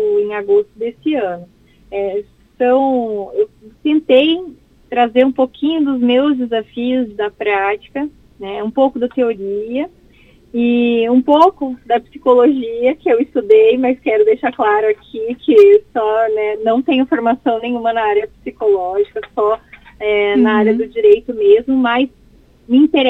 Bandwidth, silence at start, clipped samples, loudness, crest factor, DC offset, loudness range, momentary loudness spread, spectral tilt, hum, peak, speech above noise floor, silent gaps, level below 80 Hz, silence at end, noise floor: 4.7 kHz; 0 s; under 0.1%; -15 LUFS; 14 dB; under 0.1%; 5 LU; 11 LU; -7 dB/octave; none; 0 dBFS; 33 dB; none; -52 dBFS; 0 s; -47 dBFS